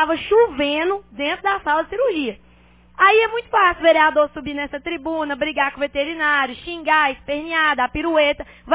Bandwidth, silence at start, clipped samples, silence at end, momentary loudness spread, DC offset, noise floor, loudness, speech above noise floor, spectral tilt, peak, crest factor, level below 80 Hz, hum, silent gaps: 4 kHz; 0 s; under 0.1%; 0 s; 12 LU; under 0.1%; -50 dBFS; -19 LUFS; 31 dB; -7 dB/octave; -2 dBFS; 16 dB; -48 dBFS; 60 Hz at -55 dBFS; none